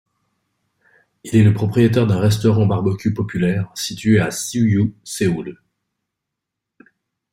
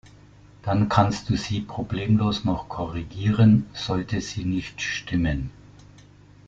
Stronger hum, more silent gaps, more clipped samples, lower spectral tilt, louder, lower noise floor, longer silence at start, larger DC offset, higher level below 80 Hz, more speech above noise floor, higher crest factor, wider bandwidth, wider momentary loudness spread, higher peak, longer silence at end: second, none vs 50 Hz at -40 dBFS; neither; neither; about the same, -6.5 dB/octave vs -6.5 dB/octave; first, -18 LUFS vs -24 LUFS; first, -81 dBFS vs -50 dBFS; first, 1.25 s vs 0.05 s; neither; second, -50 dBFS vs -44 dBFS; first, 65 dB vs 27 dB; second, 16 dB vs 22 dB; first, 16 kHz vs 7.8 kHz; second, 7 LU vs 12 LU; about the same, -2 dBFS vs -4 dBFS; first, 1.8 s vs 0.95 s